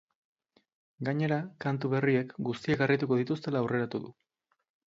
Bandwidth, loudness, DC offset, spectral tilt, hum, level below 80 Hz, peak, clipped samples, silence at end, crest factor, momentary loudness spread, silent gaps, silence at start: 7.8 kHz; -30 LUFS; under 0.1%; -8 dB/octave; none; -68 dBFS; -12 dBFS; under 0.1%; 0.85 s; 20 dB; 9 LU; none; 1 s